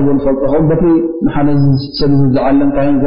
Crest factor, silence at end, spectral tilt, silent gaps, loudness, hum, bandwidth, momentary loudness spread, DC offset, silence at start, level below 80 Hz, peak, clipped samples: 8 dB; 0 s; -7.5 dB/octave; none; -12 LUFS; none; 5.4 kHz; 3 LU; 8%; 0 s; -28 dBFS; -2 dBFS; under 0.1%